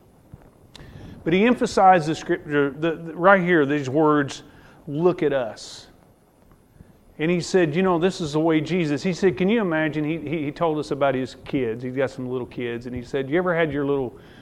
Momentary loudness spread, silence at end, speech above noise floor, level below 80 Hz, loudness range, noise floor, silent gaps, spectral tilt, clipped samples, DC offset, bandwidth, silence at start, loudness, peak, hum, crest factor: 13 LU; 0 s; 33 dB; -54 dBFS; 6 LU; -55 dBFS; none; -6.5 dB/octave; under 0.1%; under 0.1%; 12 kHz; 0.8 s; -22 LUFS; 0 dBFS; none; 22 dB